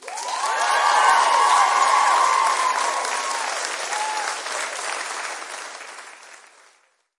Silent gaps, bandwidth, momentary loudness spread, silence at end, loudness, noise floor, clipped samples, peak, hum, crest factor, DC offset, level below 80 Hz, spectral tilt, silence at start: none; 11.5 kHz; 17 LU; 0.8 s; -20 LUFS; -61 dBFS; under 0.1%; -4 dBFS; none; 18 dB; under 0.1%; -84 dBFS; 3 dB/octave; 0 s